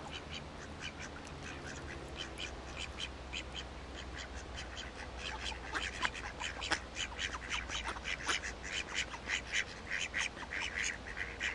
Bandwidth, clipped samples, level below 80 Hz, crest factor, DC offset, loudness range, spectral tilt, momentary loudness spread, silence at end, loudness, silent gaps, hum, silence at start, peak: 11.5 kHz; under 0.1%; -52 dBFS; 26 dB; under 0.1%; 7 LU; -2 dB/octave; 9 LU; 0 s; -40 LUFS; none; none; 0 s; -16 dBFS